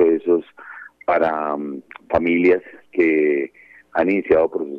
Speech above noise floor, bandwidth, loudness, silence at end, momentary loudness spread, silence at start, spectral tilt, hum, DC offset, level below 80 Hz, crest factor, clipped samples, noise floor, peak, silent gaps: 22 dB; 5.2 kHz; -19 LUFS; 0 s; 15 LU; 0 s; -8.5 dB/octave; 60 Hz at -60 dBFS; under 0.1%; -54 dBFS; 16 dB; under 0.1%; -40 dBFS; -4 dBFS; none